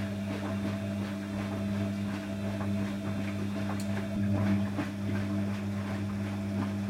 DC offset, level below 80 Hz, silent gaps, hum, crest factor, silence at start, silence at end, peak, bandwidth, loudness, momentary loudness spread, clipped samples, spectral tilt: under 0.1%; -58 dBFS; none; none; 14 dB; 0 s; 0 s; -18 dBFS; 14.5 kHz; -33 LUFS; 5 LU; under 0.1%; -7 dB/octave